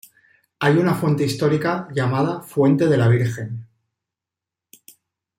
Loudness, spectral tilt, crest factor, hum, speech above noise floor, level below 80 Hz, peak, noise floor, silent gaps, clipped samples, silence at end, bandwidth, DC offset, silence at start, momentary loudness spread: -19 LUFS; -7 dB/octave; 16 dB; none; 69 dB; -60 dBFS; -4 dBFS; -87 dBFS; none; under 0.1%; 1.75 s; 16 kHz; under 0.1%; 0.6 s; 8 LU